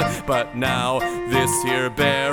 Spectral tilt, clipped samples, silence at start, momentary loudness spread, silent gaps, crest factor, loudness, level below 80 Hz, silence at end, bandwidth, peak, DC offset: -4 dB/octave; under 0.1%; 0 s; 3 LU; none; 14 dB; -21 LUFS; -44 dBFS; 0 s; 19 kHz; -6 dBFS; under 0.1%